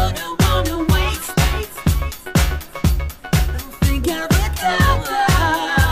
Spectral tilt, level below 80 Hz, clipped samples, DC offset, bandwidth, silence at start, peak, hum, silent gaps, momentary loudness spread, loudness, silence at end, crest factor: -5 dB/octave; -22 dBFS; under 0.1%; under 0.1%; 15.5 kHz; 0 s; -2 dBFS; none; none; 5 LU; -19 LUFS; 0 s; 16 dB